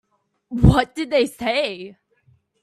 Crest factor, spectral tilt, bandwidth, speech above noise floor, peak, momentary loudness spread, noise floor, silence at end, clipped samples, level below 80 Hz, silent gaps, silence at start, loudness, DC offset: 20 dB; -6.5 dB/octave; 13 kHz; 41 dB; 0 dBFS; 17 LU; -60 dBFS; 0.7 s; under 0.1%; -32 dBFS; none; 0.5 s; -19 LUFS; under 0.1%